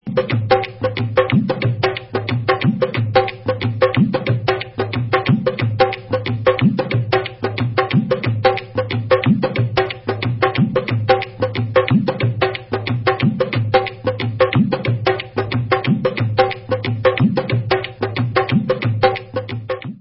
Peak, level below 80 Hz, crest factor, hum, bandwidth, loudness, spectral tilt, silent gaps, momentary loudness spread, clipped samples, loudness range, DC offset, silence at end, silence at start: 0 dBFS; -44 dBFS; 18 dB; none; 5.8 kHz; -18 LUFS; -11 dB/octave; none; 6 LU; under 0.1%; 1 LU; under 0.1%; 0 s; 0.05 s